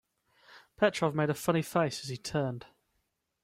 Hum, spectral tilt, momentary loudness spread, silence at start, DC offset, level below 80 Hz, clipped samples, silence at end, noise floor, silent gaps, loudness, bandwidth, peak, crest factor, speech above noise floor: none; -5.5 dB/octave; 9 LU; 0.5 s; under 0.1%; -66 dBFS; under 0.1%; 0.75 s; -80 dBFS; none; -31 LUFS; 16 kHz; -12 dBFS; 20 dB; 49 dB